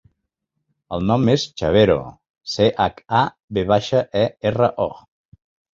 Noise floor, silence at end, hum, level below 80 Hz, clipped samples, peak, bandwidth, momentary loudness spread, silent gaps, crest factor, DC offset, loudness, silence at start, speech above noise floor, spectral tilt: -77 dBFS; 0.8 s; none; -44 dBFS; under 0.1%; -2 dBFS; 7.8 kHz; 10 LU; 2.30-2.34 s, 3.43-3.48 s; 18 dB; under 0.1%; -19 LUFS; 0.9 s; 58 dB; -6.5 dB/octave